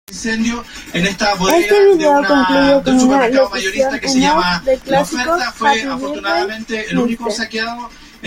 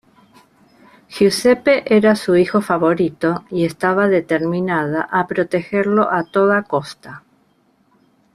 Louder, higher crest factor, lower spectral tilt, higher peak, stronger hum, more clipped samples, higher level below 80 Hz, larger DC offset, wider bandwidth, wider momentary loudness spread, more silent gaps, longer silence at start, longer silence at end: first, -14 LUFS vs -17 LUFS; about the same, 14 dB vs 16 dB; second, -4 dB/octave vs -6 dB/octave; about the same, -2 dBFS vs -2 dBFS; neither; neither; first, -40 dBFS vs -58 dBFS; neither; first, 16.5 kHz vs 14.5 kHz; first, 10 LU vs 7 LU; neither; second, 0.1 s vs 1.1 s; second, 0 s vs 1.15 s